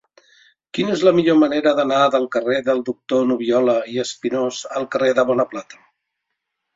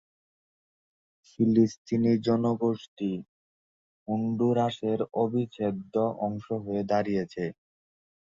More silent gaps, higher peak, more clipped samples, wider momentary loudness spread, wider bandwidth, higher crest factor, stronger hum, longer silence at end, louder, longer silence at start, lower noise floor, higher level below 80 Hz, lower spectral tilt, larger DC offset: second, none vs 1.78-1.85 s, 2.88-2.97 s, 3.28-4.06 s; first, -2 dBFS vs -10 dBFS; neither; about the same, 9 LU vs 9 LU; about the same, 7.8 kHz vs 7.4 kHz; about the same, 18 dB vs 18 dB; neither; first, 1 s vs 0.8 s; first, -18 LUFS vs -28 LUFS; second, 0.75 s vs 1.4 s; second, -78 dBFS vs under -90 dBFS; about the same, -62 dBFS vs -66 dBFS; second, -5 dB/octave vs -8 dB/octave; neither